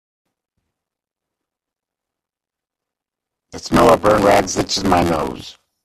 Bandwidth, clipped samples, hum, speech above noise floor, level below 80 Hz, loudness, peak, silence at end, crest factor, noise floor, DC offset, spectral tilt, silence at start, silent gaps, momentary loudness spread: 14.5 kHz; under 0.1%; none; 72 dB; -42 dBFS; -15 LUFS; 0 dBFS; 0.35 s; 20 dB; -87 dBFS; under 0.1%; -4.5 dB/octave; 3.55 s; none; 14 LU